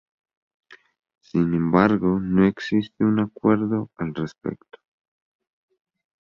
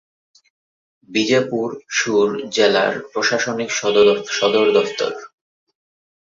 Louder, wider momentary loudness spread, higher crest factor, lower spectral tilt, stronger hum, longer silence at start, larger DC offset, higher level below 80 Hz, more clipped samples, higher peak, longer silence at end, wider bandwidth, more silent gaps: second, -22 LUFS vs -18 LUFS; first, 12 LU vs 9 LU; about the same, 22 dB vs 18 dB; first, -9 dB/octave vs -3 dB/octave; neither; second, 0.7 s vs 1.1 s; neither; first, -52 dBFS vs -62 dBFS; neither; about the same, -2 dBFS vs -2 dBFS; first, 1.65 s vs 1 s; about the same, 7 kHz vs 7.6 kHz; neither